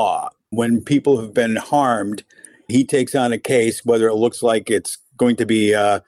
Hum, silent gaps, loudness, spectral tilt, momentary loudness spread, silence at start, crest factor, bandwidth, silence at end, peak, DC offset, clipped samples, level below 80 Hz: none; none; -18 LUFS; -5 dB/octave; 6 LU; 0 s; 12 dB; 15.5 kHz; 0.1 s; -6 dBFS; under 0.1%; under 0.1%; -60 dBFS